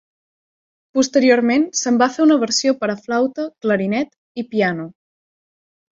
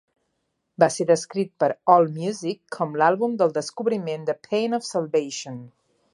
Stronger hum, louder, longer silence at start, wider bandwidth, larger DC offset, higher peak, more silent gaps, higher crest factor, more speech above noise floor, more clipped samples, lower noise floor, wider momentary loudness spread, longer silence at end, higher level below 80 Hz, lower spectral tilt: neither; first, -18 LUFS vs -23 LUFS; first, 0.95 s vs 0.8 s; second, 7.8 kHz vs 11.5 kHz; neither; about the same, -2 dBFS vs -2 dBFS; first, 4.18-4.35 s vs none; about the same, 18 dB vs 22 dB; first, over 73 dB vs 53 dB; neither; first, under -90 dBFS vs -75 dBFS; about the same, 10 LU vs 12 LU; first, 1.05 s vs 0.45 s; first, -64 dBFS vs -76 dBFS; about the same, -4 dB/octave vs -5 dB/octave